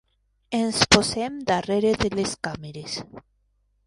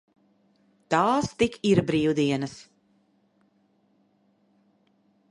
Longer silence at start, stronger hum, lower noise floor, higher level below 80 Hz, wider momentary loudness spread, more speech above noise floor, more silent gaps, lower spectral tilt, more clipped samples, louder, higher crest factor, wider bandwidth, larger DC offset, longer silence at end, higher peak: second, 0.5 s vs 0.9 s; neither; about the same, -68 dBFS vs -66 dBFS; first, -46 dBFS vs -58 dBFS; first, 15 LU vs 9 LU; about the same, 44 dB vs 43 dB; neither; second, -3.5 dB/octave vs -6 dB/octave; neither; about the same, -23 LUFS vs -24 LUFS; about the same, 24 dB vs 22 dB; about the same, 11.5 kHz vs 11 kHz; neither; second, 0.7 s vs 2.7 s; first, 0 dBFS vs -6 dBFS